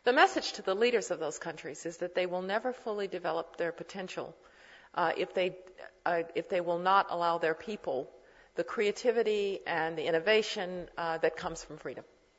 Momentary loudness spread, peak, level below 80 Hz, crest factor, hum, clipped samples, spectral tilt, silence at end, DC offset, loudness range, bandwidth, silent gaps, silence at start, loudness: 14 LU; -10 dBFS; -68 dBFS; 22 dB; none; under 0.1%; -3.5 dB/octave; 0.35 s; under 0.1%; 5 LU; 8 kHz; none; 0.05 s; -32 LUFS